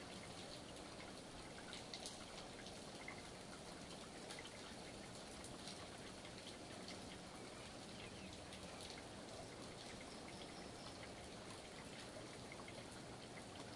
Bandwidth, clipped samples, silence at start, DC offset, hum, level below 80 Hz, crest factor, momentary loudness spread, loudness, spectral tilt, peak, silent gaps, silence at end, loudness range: 11.5 kHz; under 0.1%; 0 s; under 0.1%; none; -70 dBFS; 22 dB; 2 LU; -53 LUFS; -3.5 dB/octave; -32 dBFS; none; 0 s; 1 LU